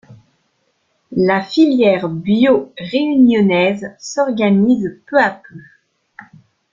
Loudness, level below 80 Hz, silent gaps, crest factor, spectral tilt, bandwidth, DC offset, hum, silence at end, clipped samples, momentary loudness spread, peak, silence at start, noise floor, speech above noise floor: -15 LUFS; -56 dBFS; none; 14 dB; -6.5 dB/octave; 7.6 kHz; under 0.1%; none; 1.1 s; under 0.1%; 9 LU; -2 dBFS; 0.1 s; -64 dBFS; 50 dB